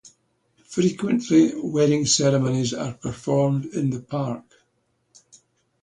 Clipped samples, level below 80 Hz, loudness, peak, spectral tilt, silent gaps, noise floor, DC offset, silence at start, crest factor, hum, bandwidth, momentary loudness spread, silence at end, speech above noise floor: under 0.1%; -58 dBFS; -22 LUFS; -6 dBFS; -5.5 dB/octave; none; -70 dBFS; under 0.1%; 0.05 s; 18 dB; none; 10.5 kHz; 12 LU; 1.4 s; 48 dB